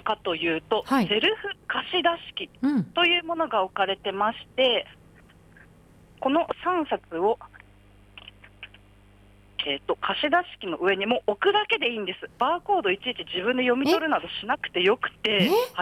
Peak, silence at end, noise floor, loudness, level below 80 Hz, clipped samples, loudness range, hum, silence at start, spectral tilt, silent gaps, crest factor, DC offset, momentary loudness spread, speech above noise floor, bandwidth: -10 dBFS; 0 s; -54 dBFS; -25 LUFS; -60 dBFS; under 0.1%; 6 LU; none; 0.05 s; -5 dB/octave; none; 16 dB; under 0.1%; 10 LU; 29 dB; 16 kHz